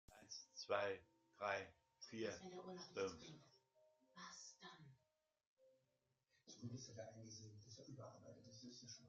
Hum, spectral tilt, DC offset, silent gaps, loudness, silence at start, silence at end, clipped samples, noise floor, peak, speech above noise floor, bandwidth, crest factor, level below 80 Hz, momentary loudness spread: none; -3 dB/octave; under 0.1%; 5.47-5.56 s; -52 LUFS; 0.1 s; 0 s; under 0.1%; -88 dBFS; -28 dBFS; 37 dB; 7.6 kHz; 26 dB; -86 dBFS; 16 LU